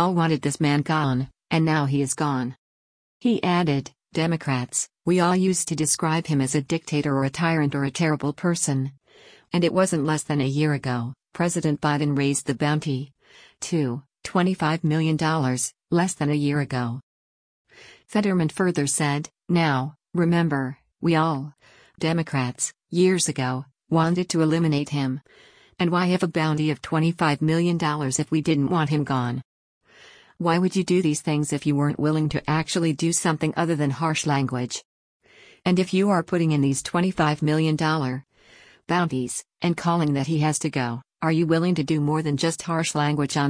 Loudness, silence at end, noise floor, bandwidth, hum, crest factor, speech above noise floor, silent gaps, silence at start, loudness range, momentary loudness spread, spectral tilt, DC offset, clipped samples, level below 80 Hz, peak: -23 LUFS; 0 s; -53 dBFS; 10.5 kHz; none; 16 dB; 31 dB; 2.58-3.20 s, 17.03-17.65 s, 29.45-29.81 s, 34.85-35.20 s; 0 s; 2 LU; 7 LU; -5.5 dB/octave; under 0.1%; under 0.1%; -58 dBFS; -6 dBFS